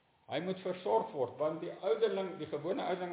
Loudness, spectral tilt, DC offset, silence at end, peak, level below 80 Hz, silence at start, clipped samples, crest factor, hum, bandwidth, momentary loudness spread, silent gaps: -36 LUFS; -4.5 dB/octave; under 0.1%; 0 s; -20 dBFS; -82 dBFS; 0.3 s; under 0.1%; 16 dB; none; 4 kHz; 7 LU; none